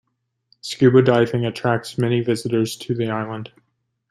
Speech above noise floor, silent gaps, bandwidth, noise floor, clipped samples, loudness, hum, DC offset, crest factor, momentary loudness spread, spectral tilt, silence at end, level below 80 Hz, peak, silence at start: 52 dB; none; 14.5 kHz; -71 dBFS; under 0.1%; -19 LUFS; none; under 0.1%; 18 dB; 17 LU; -6.5 dB/octave; 0.65 s; -60 dBFS; -2 dBFS; 0.65 s